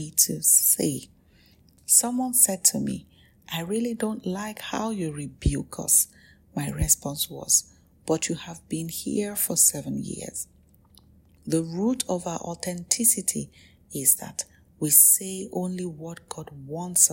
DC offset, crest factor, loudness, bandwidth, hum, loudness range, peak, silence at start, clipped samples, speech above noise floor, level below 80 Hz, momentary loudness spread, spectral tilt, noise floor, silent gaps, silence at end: under 0.1%; 26 dB; -22 LUFS; 16.5 kHz; none; 5 LU; 0 dBFS; 0 s; under 0.1%; 33 dB; -46 dBFS; 19 LU; -3 dB/octave; -58 dBFS; none; 0 s